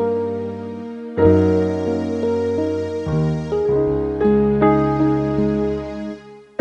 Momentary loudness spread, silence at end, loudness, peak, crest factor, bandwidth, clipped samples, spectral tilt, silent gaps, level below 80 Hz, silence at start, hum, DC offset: 14 LU; 0.2 s; -19 LUFS; -2 dBFS; 16 dB; 8.4 kHz; under 0.1%; -9 dB/octave; none; -40 dBFS; 0 s; none; under 0.1%